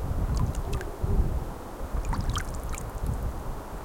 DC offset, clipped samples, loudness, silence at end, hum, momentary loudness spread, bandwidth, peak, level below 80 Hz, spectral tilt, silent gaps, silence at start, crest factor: under 0.1%; under 0.1%; -32 LUFS; 0 s; none; 8 LU; 17 kHz; -12 dBFS; -32 dBFS; -6 dB/octave; none; 0 s; 16 dB